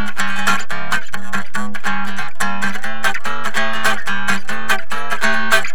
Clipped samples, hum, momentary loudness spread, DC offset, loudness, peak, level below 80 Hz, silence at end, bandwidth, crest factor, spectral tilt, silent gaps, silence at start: under 0.1%; none; 6 LU; 30%; -20 LUFS; 0 dBFS; -56 dBFS; 0 s; over 20 kHz; 22 dB; -2.5 dB/octave; none; 0 s